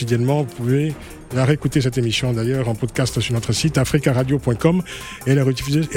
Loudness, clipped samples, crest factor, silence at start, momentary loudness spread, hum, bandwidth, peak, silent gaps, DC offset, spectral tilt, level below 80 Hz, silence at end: -19 LUFS; under 0.1%; 18 dB; 0 s; 5 LU; none; 16.5 kHz; -2 dBFS; none; under 0.1%; -6 dB/octave; -40 dBFS; 0 s